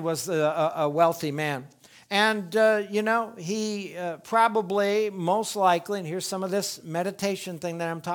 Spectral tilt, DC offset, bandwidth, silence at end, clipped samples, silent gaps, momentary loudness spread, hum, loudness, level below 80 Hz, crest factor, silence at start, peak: -4 dB/octave; under 0.1%; 19.5 kHz; 0 s; under 0.1%; none; 9 LU; none; -26 LUFS; -76 dBFS; 20 dB; 0 s; -6 dBFS